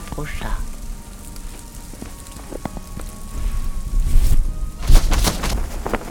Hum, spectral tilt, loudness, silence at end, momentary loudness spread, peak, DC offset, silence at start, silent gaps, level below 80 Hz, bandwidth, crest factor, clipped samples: none; -4.5 dB/octave; -25 LUFS; 0 s; 16 LU; 0 dBFS; under 0.1%; 0 s; none; -20 dBFS; 17.5 kHz; 18 dB; under 0.1%